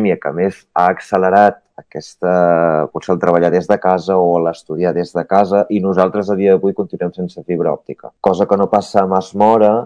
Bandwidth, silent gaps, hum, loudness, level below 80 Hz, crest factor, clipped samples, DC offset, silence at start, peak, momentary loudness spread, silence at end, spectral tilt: 10.5 kHz; none; none; -15 LUFS; -56 dBFS; 14 dB; 0.3%; under 0.1%; 0 s; 0 dBFS; 9 LU; 0 s; -7.5 dB/octave